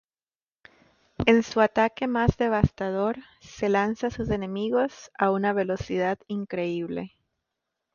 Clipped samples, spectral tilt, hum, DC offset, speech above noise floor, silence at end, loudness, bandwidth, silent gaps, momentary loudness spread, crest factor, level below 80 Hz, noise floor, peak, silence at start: under 0.1%; -6.5 dB/octave; none; under 0.1%; over 65 dB; 0.85 s; -26 LUFS; 7.2 kHz; none; 10 LU; 22 dB; -46 dBFS; under -90 dBFS; -4 dBFS; 1.2 s